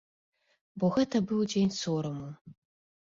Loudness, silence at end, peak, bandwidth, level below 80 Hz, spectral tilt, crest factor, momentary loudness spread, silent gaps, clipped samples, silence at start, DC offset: -30 LUFS; 0.55 s; -16 dBFS; 7.6 kHz; -66 dBFS; -6 dB/octave; 16 dB; 18 LU; 2.41-2.45 s; under 0.1%; 0.75 s; under 0.1%